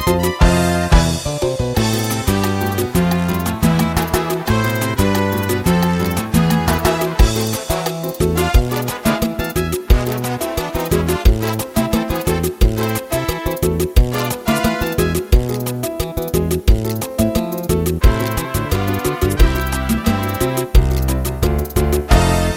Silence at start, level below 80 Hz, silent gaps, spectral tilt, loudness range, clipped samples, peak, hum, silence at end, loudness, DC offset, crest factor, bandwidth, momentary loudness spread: 0 s; -20 dBFS; none; -5.5 dB/octave; 2 LU; under 0.1%; 0 dBFS; none; 0 s; -17 LUFS; under 0.1%; 16 dB; 17 kHz; 5 LU